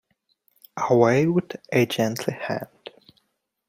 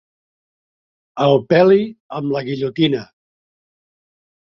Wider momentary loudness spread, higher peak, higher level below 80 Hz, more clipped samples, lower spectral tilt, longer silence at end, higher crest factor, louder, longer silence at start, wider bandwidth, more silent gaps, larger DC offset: first, 22 LU vs 14 LU; second, -4 dBFS vs 0 dBFS; about the same, -64 dBFS vs -60 dBFS; neither; second, -6 dB/octave vs -8 dB/octave; second, 1.05 s vs 1.45 s; about the same, 20 dB vs 18 dB; second, -23 LUFS vs -17 LUFS; second, 0.75 s vs 1.15 s; first, 16.5 kHz vs 6.4 kHz; second, none vs 2.00-2.10 s; neither